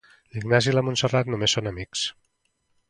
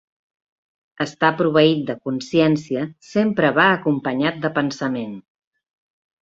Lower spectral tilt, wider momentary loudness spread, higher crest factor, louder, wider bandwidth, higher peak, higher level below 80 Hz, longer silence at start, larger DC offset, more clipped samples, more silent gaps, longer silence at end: second, -4 dB/octave vs -6 dB/octave; about the same, 10 LU vs 11 LU; about the same, 22 dB vs 20 dB; second, -24 LUFS vs -20 LUFS; first, 11 kHz vs 7.8 kHz; about the same, -4 dBFS vs -2 dBFS; first, -52 dBFS vs -62 dBFS; second, 0.35 s vs 1 s; neither; neither; neither; second, 0.8 s vs 1 s